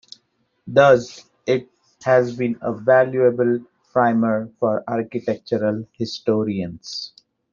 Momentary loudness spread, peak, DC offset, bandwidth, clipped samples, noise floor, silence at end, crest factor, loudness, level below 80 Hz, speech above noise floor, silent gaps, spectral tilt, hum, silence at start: 13 LU; 0 dBFS; under 0.1%; 7.4 kHz; under 0.1%; -66 dBFS; 0.45 s; 20 dB; -20 LUFS; -62 dBFS; 47 dB; none; -6.5 dB/octave; none; 0.65 s